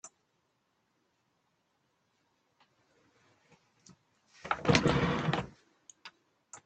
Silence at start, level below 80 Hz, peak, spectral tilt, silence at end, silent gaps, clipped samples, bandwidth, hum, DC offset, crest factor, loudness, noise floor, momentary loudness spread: 0.05 s; -56 dBFS; -8 dBFS; -5 dB/octave; 0.1 s; none; under 0.1%; 8.8 kHz; none; under 0.1%; 30 dB; -30 LUFS; -77 dBFS; 27 LU